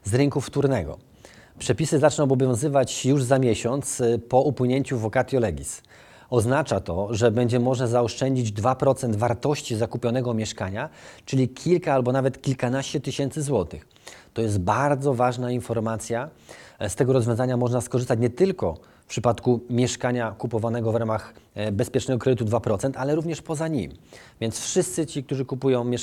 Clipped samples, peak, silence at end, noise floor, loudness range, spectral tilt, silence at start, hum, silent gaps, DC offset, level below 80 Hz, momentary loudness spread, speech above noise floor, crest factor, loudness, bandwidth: under 0.1%; -4 dBFS; 0 s; -49 dBFS; 3 LU; -6 dB/octave; 0.05 s; none; none; under 0.1%; -54 dBFS; 9 LU; 26 dB; 20 dB; -24 LUFS; 14 kHz